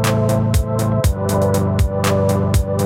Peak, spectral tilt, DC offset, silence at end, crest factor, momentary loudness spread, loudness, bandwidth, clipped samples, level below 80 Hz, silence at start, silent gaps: -4 dBFS; -6.5 dB/octave; under 0.1%; 0 s; 12 dB; 2 LU; -17 LUFS; 16.5 kHz; under 0.1%; -24 dBFS; 0 s; none